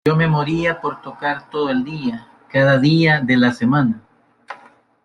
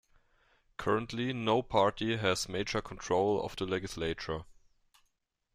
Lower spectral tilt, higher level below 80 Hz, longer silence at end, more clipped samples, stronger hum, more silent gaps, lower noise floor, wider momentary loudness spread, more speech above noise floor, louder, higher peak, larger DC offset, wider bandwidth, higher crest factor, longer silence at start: first, -7.5 dB/octave vs -4.5 dB/octave; about the same, -52 dBFS vs -56 dBFS; second, 0.5 s vs 1 s; neither; neither; neither; second, -48 dBFS vs -78 dBFS; first, 19 LU vs 9 LU; second, 32 dB vs 46 dB; first, -17 LUFS vs -33 LUFS; first, -4 dBFS vs -12 dBFS; neither; second, 9.8 kHz vs 15.5 kHz; second, 14 dB vs 22 dB; second, 0.05 s vs 0.8 s